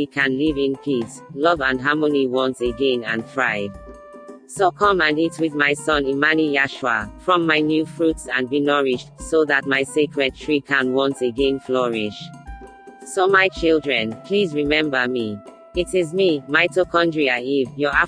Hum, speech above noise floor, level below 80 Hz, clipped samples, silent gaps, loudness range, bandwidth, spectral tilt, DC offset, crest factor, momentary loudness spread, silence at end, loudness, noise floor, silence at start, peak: none; 21 dB; -46 dBFS; under 0.1%; none; 2 LU; 10.5 kHz; -4.5 dB/octave; under 0.1%; 18 dB; 9 LU; 0 s; -20 LUFS; -41 dBFS; 0 s; -2 dBFS